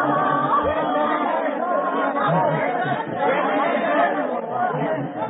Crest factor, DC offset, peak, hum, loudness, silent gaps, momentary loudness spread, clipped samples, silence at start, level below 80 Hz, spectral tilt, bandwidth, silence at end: 14 dB; under 0.1%; -8 dBFS; none; -21 LUFS; none; 4 LU; under 0.1%; 0 s; -54 dBFS; -11 dB/octave; 4 kHz; 0 s